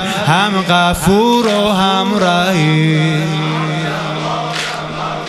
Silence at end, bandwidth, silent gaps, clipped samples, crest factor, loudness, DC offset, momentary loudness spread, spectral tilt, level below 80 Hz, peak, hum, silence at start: 0 s; 13.5 kHz; none; under 0.1%; 14 dB; -14 LUFS; under 0.1%; 7 LU; -5 dB/octave; -38 dBFS; 0 dBFS; none; 0 s